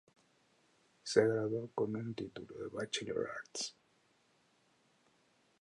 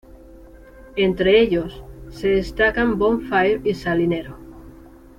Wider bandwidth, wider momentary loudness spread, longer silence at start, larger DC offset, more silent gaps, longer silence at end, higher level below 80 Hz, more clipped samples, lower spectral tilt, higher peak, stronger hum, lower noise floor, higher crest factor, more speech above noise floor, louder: second, 11 kHz vs 13.5 kHz; second, 14 LU vs 19 LU; first, 1.05 s vs 0.35 s; neither; neither; first, 1.9 s vs 0.45 s; second, -76 dBFS vs -40 dBFS; neither; second, -4.5 dB/octave vs -6.5 dB/octave; second, -14 dBFS vs -6 dBFS; neither; first, -73 dBFS vs -44 dBFS; first, 26 dB vs 16 dB; first, 36 dB vs 25 dB; second, -38 LUFS vs -19 LUFS